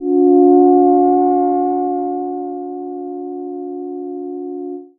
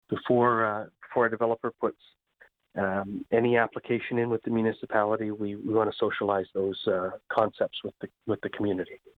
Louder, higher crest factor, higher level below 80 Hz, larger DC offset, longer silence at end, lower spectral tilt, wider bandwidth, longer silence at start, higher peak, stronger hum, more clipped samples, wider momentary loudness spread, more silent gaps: first, -14 LUFS vs -28 LUFS; about the same, 14 dB vs 18 dB; first, -58 dBFS vs -66 dBFS; neither; about the same, 0.15 s vs 0.2 s; first, -11 dB/octave vs -8.5 dB/octave; second, 2.1 kHz vs 4.7 kHz; about the same, 0 s vs 0.1 s; first, 0 dBFS vs -10 dBFS; neither; neither; first, 16 LU vs 9 LU; neither